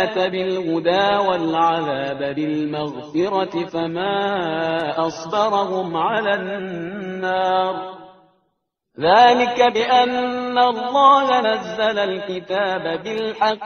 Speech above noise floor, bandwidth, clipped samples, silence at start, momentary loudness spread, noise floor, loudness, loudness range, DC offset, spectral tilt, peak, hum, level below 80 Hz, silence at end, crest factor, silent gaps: 54 dB; 6.6 kHz; under 0.1%; 0 s; 11 LU; -73 dBFS; -19 LUFS; 6 LU; under 0.1%; -2.5 dB/octave; 0 dBFS; none; -60 dBFS; 0 s; 18 dB; none